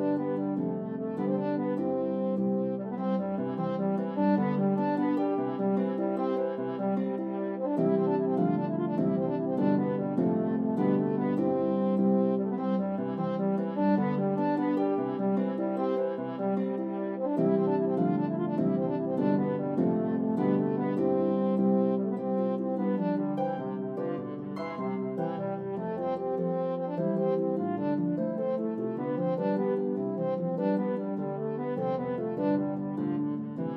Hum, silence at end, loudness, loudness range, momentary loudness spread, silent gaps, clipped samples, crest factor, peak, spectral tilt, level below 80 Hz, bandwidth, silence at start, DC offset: none; 0 s; -29 LUFS; 3 LU; 6 LU; none; under 0.1%; 14 dB; -14 dBFS; -11 dB/octave; -80 dBFS; 4.7 kHz; 0 s; under 0.1%